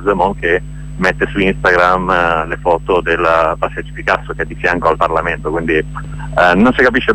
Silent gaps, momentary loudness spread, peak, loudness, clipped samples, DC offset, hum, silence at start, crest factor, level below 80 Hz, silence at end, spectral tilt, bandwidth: none; 10 LU; 0 dBFS; -14 LUFS; under 0.1%; under 0.1%; none; 0 s; 14 dB; -30 dBFS; 0 s; -6.5 dB/octave; 12 kHz